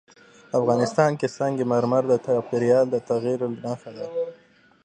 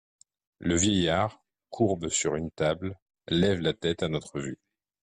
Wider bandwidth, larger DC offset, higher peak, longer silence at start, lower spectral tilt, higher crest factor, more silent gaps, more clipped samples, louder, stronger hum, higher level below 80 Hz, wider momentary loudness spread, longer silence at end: second, 9.6 kHz vs 11 kHz; neither; first, -4 dBFS vs -12 dBFS; about the same, 0.55 s vs 0.6 s; first, -7 dB/octave vs -4.5 dB/octave; about the same, 18 dB vs 16 dB; second, none vs 3.02-3.06 s; neither; first, -23 LUFS vs -28 LUFS; neither; second, -68 dBFS vs -56 dBFS; about the same, 12 LU vs 14 LU; about the same, 0.5 s vs 0.5 s